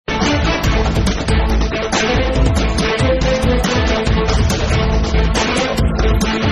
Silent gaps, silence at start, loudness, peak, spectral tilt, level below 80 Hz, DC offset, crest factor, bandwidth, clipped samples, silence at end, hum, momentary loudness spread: none; 0.1 s; -16 LUFS; -2 dBFS; -5 dB/octave; -18 dBFS; under 0.1%; 12 dB; 13.5 kHz; under 0.1%; 0 s; none; 2 LU